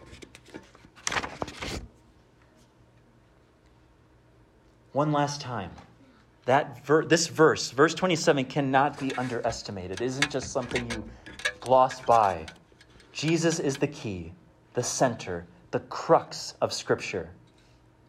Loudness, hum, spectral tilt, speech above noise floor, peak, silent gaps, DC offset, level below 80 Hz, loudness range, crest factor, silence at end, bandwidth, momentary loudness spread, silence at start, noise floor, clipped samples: -27 LUFS; none; -4.5 dB/octave; 33 dB; -8 dBFS; none; under 0.1%; -56 dBFS; 13 LU; 20 dB; 0.75 s; 14.5 kHz; 17 LU; 0 s; -60 dBFS; under 0.1%